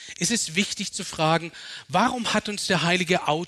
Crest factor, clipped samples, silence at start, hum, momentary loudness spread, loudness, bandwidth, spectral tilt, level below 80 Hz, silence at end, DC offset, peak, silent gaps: 18 dB; under 0.1%; 0 s; none; 7 LU; -24 LUFS; 13.5 kHz; -3.5 dB/octave; -58 dBFS; 0 s; under 0.1%; -8 dBFS; none